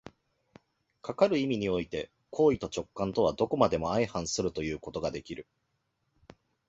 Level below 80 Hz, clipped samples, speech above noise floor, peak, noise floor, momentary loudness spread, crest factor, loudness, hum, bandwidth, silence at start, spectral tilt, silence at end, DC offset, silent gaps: -56 dBFS; under 0.1%; 49 dB; -8 dBFS; -78 dBFS; 13 LU; 24 dB; -30 LUFS; none; 8 kHz; 0.05 s; -5 dB/octave; 1.25 s; under 0.1%; none